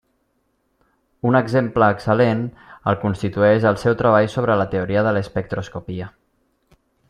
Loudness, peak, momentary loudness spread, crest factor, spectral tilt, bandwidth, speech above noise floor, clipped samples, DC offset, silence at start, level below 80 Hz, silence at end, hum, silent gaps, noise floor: -19 LUFS; -2 dBFS; 14 LU; 18 dB; -8 dB/octave; 11 kHz; 49 dB; under 0.1%; under 0.1%; 1.25 s; -50 dBFS; 1 s; none; none; -68 dBFS